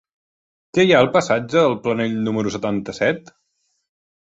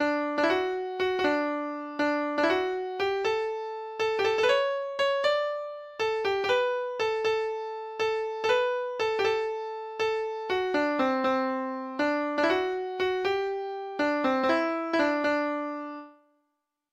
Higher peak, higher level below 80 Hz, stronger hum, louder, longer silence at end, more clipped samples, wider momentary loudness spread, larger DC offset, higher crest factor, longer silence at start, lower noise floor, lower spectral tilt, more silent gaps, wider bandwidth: first, -2 dBFS vs -12 dBFS; first, -56 dBFS vs -66 dBFS; neither; first, -19 LUFS vs -28 LUFS; first, 1.05 s vs 0.8 s; neither; first, 10 LU vs 7 LU; neither; about the same, 18 dB vs 16 dB; first, 0.75 s vs 0 s; second, -70 dBFS vs -80 dBFS; first, -5.5 dB/octave vs -4 dB/octave; neither; second, 8 kHz vs 13 kHz